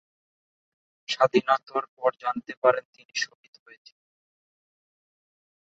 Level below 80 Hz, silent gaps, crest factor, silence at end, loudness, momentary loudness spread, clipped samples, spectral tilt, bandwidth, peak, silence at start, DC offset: -76 dBFS; 1.88-1.97 s, 2.57-2.62 s, 2.85-2.93 s, 3.05-3.09 s; 24 dB; 2.35 s; -26 LUFS; 11 LU; under 0.1%; -3.5 dB/octave; 8 kHz; -6 dBFS; 1.1 s; under 0.1%